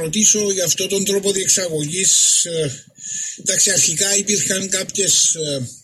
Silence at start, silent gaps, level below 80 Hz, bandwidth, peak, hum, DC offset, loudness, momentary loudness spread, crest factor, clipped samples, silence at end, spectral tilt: 0 s; none; -58 dBFS; 15.5 kHz; -2 dBFS; none; under 0.1%; -15 LUFS; 11 LU; 16 dB; under 0.1%; 0.05 s; -1.5 dB/octave